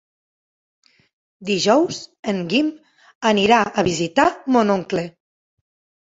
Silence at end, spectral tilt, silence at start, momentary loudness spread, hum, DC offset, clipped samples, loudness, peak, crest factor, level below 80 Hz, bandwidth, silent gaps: 1.05 s; -4.5 dB/octave; 1.4 s; 10 LU; none; under 0.1%; under 0.1%; -19 LUFS; -2 dBFS; 20 dB; -56 dBFS; 8 kHz; 2.19-2.23 s, 3.15-3.21 s